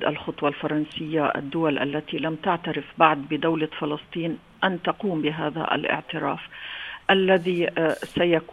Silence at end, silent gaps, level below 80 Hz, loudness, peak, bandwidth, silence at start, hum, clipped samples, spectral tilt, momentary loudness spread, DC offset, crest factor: 0.05 s; none; -60 dBFS; -25 LUFS; -2 dBFS; 12 kHz; 0 s; none; under 0.1%; -6.5 dB/octave; 10 LU; under 0.1%; 22 dB